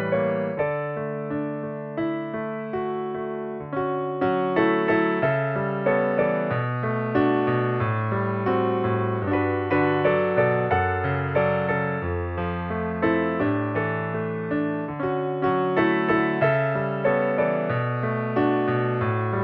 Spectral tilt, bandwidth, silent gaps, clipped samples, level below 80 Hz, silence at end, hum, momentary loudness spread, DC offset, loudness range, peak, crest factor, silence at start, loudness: -6.5 dB/octave; 5.4 kHz; none; under 0.1%; -52 dBFS; 0 s; none; 8 LU; under 0.1%; 4 LU; -8 dBFS; 16 dB; 0 s; -24 LUFS